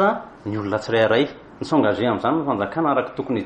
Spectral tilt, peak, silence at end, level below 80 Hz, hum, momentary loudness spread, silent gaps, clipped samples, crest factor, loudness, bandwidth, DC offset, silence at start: -7 dB/octave; -6 dBFS; 0 s; -56 dBFS; none; 9 LU; none; under 0.1%; 16 dB; -21 LUFS; 9.2 kHz; under 0.1%; 0 s